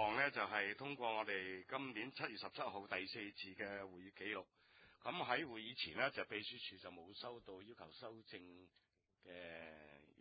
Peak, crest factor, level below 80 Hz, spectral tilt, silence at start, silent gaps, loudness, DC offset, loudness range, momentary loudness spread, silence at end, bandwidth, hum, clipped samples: -22 dBFS; 24 dB; -80 dBFS; -1 dB/octave; 0 s; none; -45 LUFS; under 0.1%; 10 LU; 16 LU; 0.15 s; 4.9 kHz; none; under 0.1%